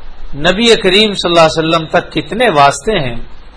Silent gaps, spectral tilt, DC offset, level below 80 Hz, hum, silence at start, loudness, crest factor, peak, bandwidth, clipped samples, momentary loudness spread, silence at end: none; -4 dB/octave; under 0.1%; -28 dBFS; none; 0 s; -10 LUFS; 12 dB; 0 dBFS; 11 kHz; 0.9%; 9 LU; 0.05 s